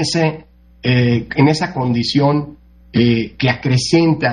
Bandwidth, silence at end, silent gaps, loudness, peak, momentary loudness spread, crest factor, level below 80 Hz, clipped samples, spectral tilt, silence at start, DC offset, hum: 10.5 kHz; 0 s; none; -16 LUFS; 0 dBFS; 7 LU; 16 dB; -44 dBFS; under 0.1%; -6 dB/octave; 0 s; under 0.1%; none